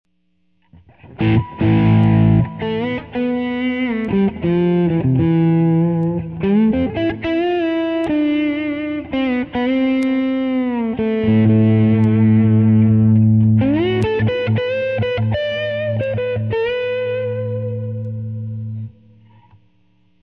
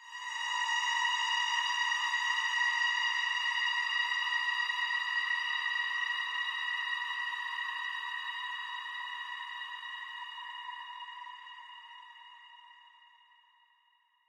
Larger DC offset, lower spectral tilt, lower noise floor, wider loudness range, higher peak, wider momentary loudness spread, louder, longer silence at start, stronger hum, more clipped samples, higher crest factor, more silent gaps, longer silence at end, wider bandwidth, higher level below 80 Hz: first, 0.1% vs under 0.1%; first, -10 dB/octave vs 9 dB/octave; second, -66 dBFS vs -71 dBFS; second, 8 LU vs 16 LU; first, -4 dBFS vs -20 dBFS; second, 10 LU vs 16 LU; first, -17 LUFS vs -32 LUFS; first, 1.05 s vs 0 s; neither; neither; about the same, 14 dB vs 16 dB; neither; about the same, 1.3 s vs 1.4 s; second, 5 kHz vs 14 kHz; first, -42 dBFS vs under -90 dBFS